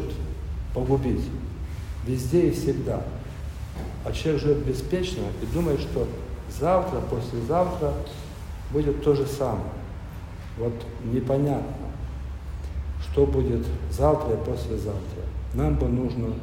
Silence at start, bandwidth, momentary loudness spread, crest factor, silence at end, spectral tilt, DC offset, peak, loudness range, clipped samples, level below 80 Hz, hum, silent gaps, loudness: 0 s; 16 kHz; 13 LU; 18 dB; 0 s; -7.5 dB/octave; under 0.1%; -8 dBFS; 2 LU; under 0.1%; -34 dBFS; none; none; -27 LUFS